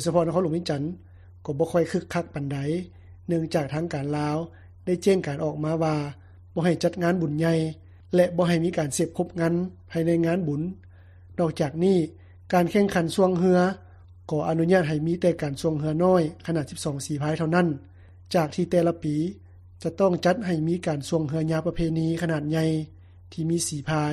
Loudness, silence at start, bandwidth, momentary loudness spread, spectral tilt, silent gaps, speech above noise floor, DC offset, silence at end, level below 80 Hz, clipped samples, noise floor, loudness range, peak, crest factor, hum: -25 LUFS; 0 s; 13.5 kHz; 11 LU; -6.5 dB/octave; none; 24 dB; under 0.1%; 0 s; -52 dBFS; under 0.1%; -48 dBFS; 4 LU; -8 dBFS; 18 dB; none